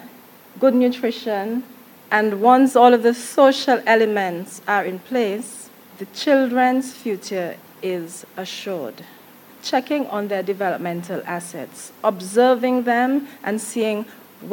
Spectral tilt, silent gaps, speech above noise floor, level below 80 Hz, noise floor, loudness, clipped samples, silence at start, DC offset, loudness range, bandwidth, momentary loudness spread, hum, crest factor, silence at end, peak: -4.5 dB/octave; none; 26 dB; -78 dBFS; -45 dBFS; -20 LUFS; under 0.1%; 0 s; under 0.1%; 9 LU; 17.5 kHz; 16 LU; none; 20 dB; 0 s; 0 dBFS